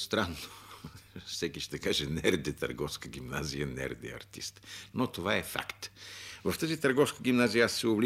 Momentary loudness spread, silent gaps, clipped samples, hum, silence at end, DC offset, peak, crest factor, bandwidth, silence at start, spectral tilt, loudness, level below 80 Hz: 17 LU; none; under 0.1%; none; 0 s; under 0.1%; -12 dBFS; 20 dB; 16 kHz; 0 s; -4 dB/octave; -32 LUFS; -56 dBFS